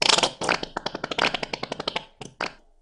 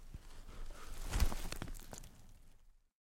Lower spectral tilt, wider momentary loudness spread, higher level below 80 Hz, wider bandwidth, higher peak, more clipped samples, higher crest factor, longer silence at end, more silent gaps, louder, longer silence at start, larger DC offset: second, -1.5 dB/octave vs -4 dB/octave; second, 12 LU vs 20 LU; second, -54 dBFS vs -44 dBFS; second, 13 kHz vs 16.5 kHz; first, 0 dBFS vs -20 dBFS; neither; about the same, 26 dB vs 22 dB; about the same, 0.3 s vs 0.4 s; neither; first, -26 LUFS vs -45 LUFS; about the same, 0 s vs 0 s; neither